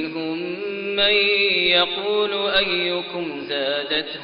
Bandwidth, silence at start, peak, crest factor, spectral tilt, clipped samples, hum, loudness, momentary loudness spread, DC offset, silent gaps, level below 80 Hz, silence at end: 5.4 kHz; 0 s; -6 dBFS; 16 dB; 0 dB/octave; under 0.1%; none; -20 LUFS; 11 LU; under 0.1%; none; -56 dBFS; 0 s